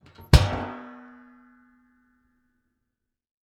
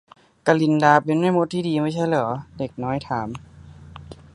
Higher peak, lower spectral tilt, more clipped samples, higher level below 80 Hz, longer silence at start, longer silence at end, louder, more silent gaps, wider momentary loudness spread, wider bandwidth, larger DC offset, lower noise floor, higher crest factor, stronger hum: about the same, 0 dBFS vs 0 dBFS; second, -5.5 dB/octave vs -7 dB/octave; neither; first, -32 dBFS vs -52 dBFS; second, 0.3 s vs 0.45 s; first, 2.65 s vs 0.2 s; about the same, -23 LUFS vs -21 LUFS; neither; first, 25 LU vs 16 LU; first, 17 kHz vs 11 kHz; neither; first, -82 dBFS vs -42 dBFS; first, 28 dB vs 22 dB; neither